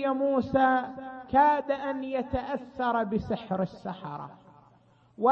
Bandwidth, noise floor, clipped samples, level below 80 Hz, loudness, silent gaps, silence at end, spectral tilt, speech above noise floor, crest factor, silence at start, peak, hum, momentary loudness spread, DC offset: 6.4 kHz; -61 dBFS; under 0.1%; -54 dBFS; -28 LUFS; none; 0 s; -8 dB/octave; 33 dB; 18 dB; 0 s; -10 dBFS; none; 15 LU; under 0.1%